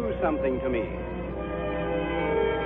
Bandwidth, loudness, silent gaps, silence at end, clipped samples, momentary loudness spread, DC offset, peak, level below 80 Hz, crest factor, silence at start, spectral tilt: 4 kHz; -29 LUFS; none; 0 s; under 0.1%; 7 LU; under 0.1%; -14 dBFS; -40 dBFS; 14 dB; 0 s; -10.5 dB/octave